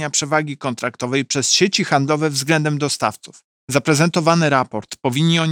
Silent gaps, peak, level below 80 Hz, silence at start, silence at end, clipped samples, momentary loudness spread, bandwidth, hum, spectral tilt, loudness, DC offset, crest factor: 3.44-3.68 s; -2 dBFS; -64 dBFS; 0 s; 0 s; under 0.1%; 9 LU; 16.5 kHz; none; -4 dB/octave; -18 LUFS; under 0.1%; 18 dB